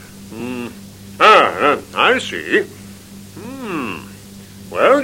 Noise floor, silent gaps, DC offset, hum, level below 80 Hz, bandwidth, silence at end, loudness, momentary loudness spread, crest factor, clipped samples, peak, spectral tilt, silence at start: -37 dBFS; none; under 0.1%; none; -54 dBFS; 16.5 kHz; 0 s; -15 LUFS; 27 LU; 18 dB; under 0.1%; 0 dBFS; -4 dB/octave; 0 s